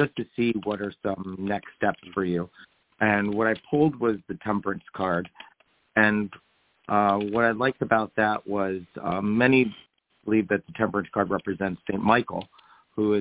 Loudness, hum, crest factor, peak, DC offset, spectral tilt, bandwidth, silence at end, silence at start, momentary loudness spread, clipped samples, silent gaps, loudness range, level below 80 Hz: -26 LUFS; none; 22 dB; -4 dBFS; under 0.1%; -10.5 dB/octave; 4 kHz; 0 s; 0 s; 9 LU; under 0.1%; none; 3 LU; -58 dBFS